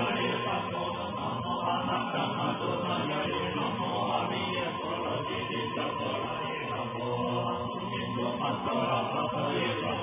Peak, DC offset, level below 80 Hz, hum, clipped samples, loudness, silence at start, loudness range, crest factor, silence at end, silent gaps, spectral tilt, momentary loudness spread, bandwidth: -16 dBFS; under 0.1%; -58 dBFS; none; under 0.1%; -31 LUFS; 0 s; 2 LU; 16 dB; 0 s; none; -3.5 dB/octave; 4 LU; 3.8 kHz